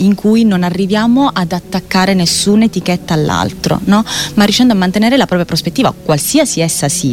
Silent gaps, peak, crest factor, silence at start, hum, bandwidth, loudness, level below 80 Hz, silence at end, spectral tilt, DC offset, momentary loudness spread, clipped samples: none; 0 dBFS; 12 dB; 0 s; none; 17 kHz; -12 LUFS; -38 dBFS; 0 s; -4.5 dB/octave; under 0.1%; 5 LU; under 0.1%